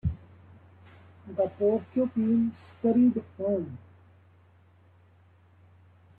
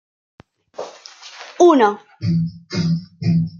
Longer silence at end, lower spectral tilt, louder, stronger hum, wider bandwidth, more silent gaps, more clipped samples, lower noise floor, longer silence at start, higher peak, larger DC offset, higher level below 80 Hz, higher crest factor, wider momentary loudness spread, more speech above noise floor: first, 2.4 s vs 0 s; first, -12 dB/octave vs -7 dB/octave; second, -27 LUFS vs -18 LUFS; neither; second, 3.6 kHz vs 7.4 kHz; neither; neither; first, -59 dBFS vs -40 dBFS; second, 0.05 s vs 0.8 s; second, -14 dBFS vs -2 dBFS; neither; about the same, -54 dBFS vs -58 dBFS; about the same, 16 dB vs 18 dB; second, 15 LU vs 24 LU; first, 33 dB vs 24 dB